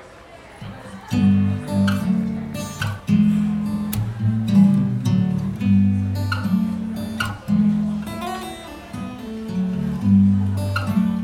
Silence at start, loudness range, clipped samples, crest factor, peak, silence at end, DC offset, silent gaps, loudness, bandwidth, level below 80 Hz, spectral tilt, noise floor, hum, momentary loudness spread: 0 s; 4 LU; under 0.1%; 14 dB; -6 dBFS; 0 s; under 0.1%; none; -21 LUFS; 16.5 kHz; -46 dBFS; -7.5 dB/octave; -42 dBFS; none; 15 LU